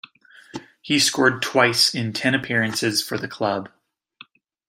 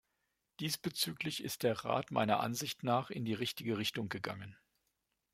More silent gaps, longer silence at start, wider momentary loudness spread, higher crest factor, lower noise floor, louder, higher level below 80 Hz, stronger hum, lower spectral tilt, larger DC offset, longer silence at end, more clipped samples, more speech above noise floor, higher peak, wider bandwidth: neither; about the same, 0.55 s vs 0.6 s; first, 19 LU vs 8 LU; about the same, 20 dB vs 22 dB; second, -50 dBFS vs -84 dBFS; first, -20 LUFS vs -37 LUFS; first, -66 dBFS vs -74 dBFS; neither; about the same, -3 dB/octave vs -4 dB/octave; neither; first, 1 s vs 0.8 s; neither; second, 29 dB vs 47 dB; first, -2 dBFS vs -16 dBFS; about the same, 16.5 kHz vs 16.5 kHz